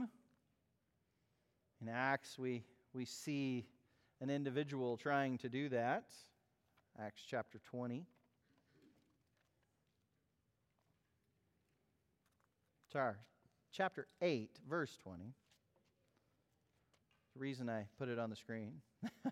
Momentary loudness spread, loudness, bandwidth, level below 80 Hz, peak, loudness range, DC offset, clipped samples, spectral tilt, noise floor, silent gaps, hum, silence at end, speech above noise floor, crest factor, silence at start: 15 LU; -44 LUFS; 15.5 kHz; -88 dBFS; -24 dBFS; 9 LU; under 0.1%; under 0.1%; -6 dB/octave; -84 dBFS; none; none; 0 s; 40 dB; 24 dB; 0 s